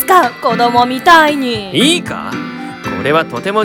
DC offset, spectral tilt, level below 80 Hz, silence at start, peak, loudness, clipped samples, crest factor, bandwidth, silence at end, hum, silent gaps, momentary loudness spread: under 0.1%; -3.5 dB/octave; -46 dBFS; 0 s; 0 dBFS; -12 LUFS; 1%; 12 dB; over 20 kHz; 0 s; none; none; 14 LU